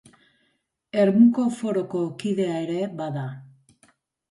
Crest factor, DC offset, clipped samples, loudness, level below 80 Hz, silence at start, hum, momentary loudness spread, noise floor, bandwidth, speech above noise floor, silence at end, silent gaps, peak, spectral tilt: 18 dB; under 0.1%; under 0.1%; -23 LUFS; -70 dBFS; 0.95 s; none; 14 LU; -71 dBFS; 11.5 kHz; 49 dB; 0.85 s; none; -6 dBFS; -7.5 dB/octave